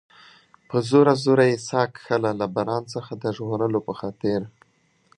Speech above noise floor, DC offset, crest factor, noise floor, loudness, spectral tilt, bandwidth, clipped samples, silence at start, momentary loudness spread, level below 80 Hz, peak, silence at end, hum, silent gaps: 41 dB; under 0.1%; 20 dB; -63 dBFS; -23 LUFS; -6.5 dB/octave; 10.5 kHz; under 0.1%; 0.7 s; 12 LU; -62 dBFS; -4 dBFS; 0.7 s; none; none